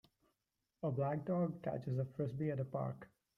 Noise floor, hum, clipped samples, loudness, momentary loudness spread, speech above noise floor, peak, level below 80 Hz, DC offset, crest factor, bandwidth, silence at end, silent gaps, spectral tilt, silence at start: -88 dBFS; none; under 0.1%; -40 LUFS; 6 LU; 49 dB; -26 dBFS; -74 dBFS; under 0.1%; 14 dB; 4.9 kHz; 0.3 s; none; -10.5 dB/octave; 0.85 s